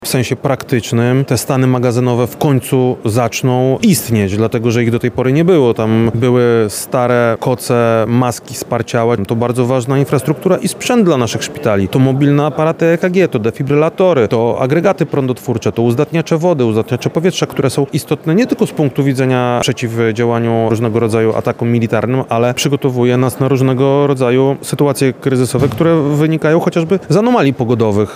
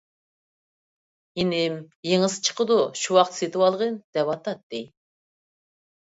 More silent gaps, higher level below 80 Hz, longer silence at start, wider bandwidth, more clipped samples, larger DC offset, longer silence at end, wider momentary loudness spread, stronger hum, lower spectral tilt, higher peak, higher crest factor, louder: second, none vs 1.95-2.03 s, 4.04-4.13 s, 4.63-4.70 s; first, -48 dBFS vs -66 dBFS; second, 0 s vs 1.35 s; first, 16 kHz vs 8 kHz; neither; neither; second, 0 s vs 1.15 s; second, 4 LU vs 13 LU; neither; first, -6.5 dB/octave vs -4 dB/octave; first, 0 dBFS vs -4 dBFS; second, 12 dB vs 22 dB; first, -13 LUFS vs -24 LUFS